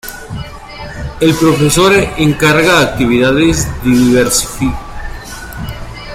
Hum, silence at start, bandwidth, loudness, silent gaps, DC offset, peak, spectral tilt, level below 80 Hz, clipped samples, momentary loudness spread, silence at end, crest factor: none; 0.05 s; 16.5 kHz; -10 LUFS; none; under 0.1%; 0 dBFS; -4.5 dB/octave; -28 dBFS; under 0.1%; 18 LU; 0 s; 12 dB